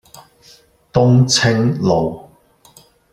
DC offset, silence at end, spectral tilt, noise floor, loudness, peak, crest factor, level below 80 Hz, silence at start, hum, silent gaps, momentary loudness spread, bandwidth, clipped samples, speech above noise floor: under 0.1%; 0.9 s; -5 dB/octave; -50 dBFS; -15 LUFS; -2 dBFS; 16 dB; -46 dBFS; 0.15 s; none; none; 11 LU; 12 kHz; under 0.1%; 36 dB